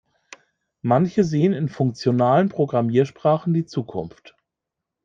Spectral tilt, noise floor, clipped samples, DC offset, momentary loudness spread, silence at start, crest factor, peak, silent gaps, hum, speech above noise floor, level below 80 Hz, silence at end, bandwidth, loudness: -8 dB/octave; -84 dBFS; under 0.1%; under 0.1%; 11 LU; 0.85 s; 16 dB; -4 dBFS; none; none; 64 dB; -60 dBFS; 0.95 s; 7.6 kHz; -21 LUFS